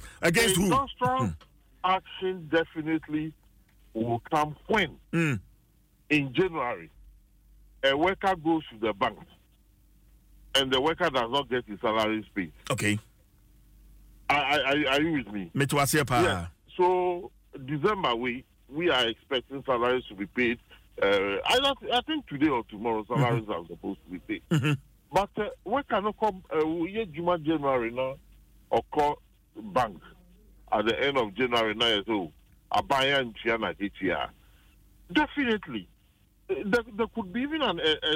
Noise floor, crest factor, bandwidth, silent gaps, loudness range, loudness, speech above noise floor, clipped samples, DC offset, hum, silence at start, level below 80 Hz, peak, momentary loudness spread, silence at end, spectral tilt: -63 dBFS; 18 dB; 16 kHz; none; 4 LU; -28 LUFS; 35 dB; under 0.1%; under 0.1%; none; 0 s; -54 dBFS; -10 dBFS; 11 LU; 0 s; -4.5 dB/octave